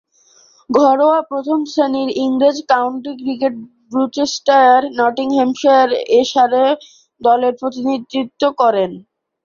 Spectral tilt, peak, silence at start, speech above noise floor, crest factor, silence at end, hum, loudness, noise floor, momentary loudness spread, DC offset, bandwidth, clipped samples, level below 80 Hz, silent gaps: -4 dB/octave; -2 dBFS; 0.7 s; 37 dB; 14 dB; 0.45 s; none; -15 LUFS; -51 dBFS; 9 LU; under 0.1%; 7.4 kHz; under 0.1%; -62 dBFS; none